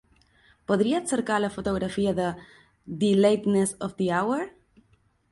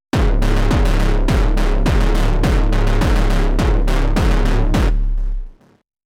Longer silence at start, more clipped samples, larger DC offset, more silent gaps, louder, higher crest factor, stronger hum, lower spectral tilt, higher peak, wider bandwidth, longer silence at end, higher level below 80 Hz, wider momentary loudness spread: first, 0.7 s vs 0.15 s; neither; neither; neither; second, -25 LUFS vs -18 LUFS; first, 18 dB vs 10 dB; neither; about the same, -5.5 dB/octave vs -6.5 dB/octave; second, -8 dBFS vs -4 dBFS; about the same, 11.5 kHz vs 11.5 kHz; first, 0.85 s vs 0.55 s; second, -56 dBFS vs -16 dBFS; first, 11 LU vs 3 LU